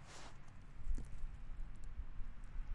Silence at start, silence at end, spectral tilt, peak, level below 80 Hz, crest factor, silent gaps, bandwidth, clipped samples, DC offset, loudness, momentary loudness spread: 0 s; 0 s; -5 dB/octave; -28 dBFS; -46 dBFS; 14 dB; none; 10.5 kHz; under 0.1%; under 0.1%; -54 LUFS; 8 LU